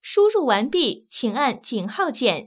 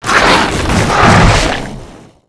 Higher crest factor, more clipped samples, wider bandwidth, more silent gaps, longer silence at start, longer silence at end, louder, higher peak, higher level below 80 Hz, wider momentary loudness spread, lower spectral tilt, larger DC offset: first, 16 dB vs 10 dB; neither; second, 4 kHz vs 11 kHz; neither; about the same, 0.05 s vs 0 s; second, 0 s vs 0.3 s; second, -22 LUFS vs -9 LUFS; second, -6 dBFS vs 0 dBFS; second, -70 dBFS vs -20 dBFS; about the same, 10 LU vs 11 LU; first, -9 dB/octave vs -4.5 dB/octave; neither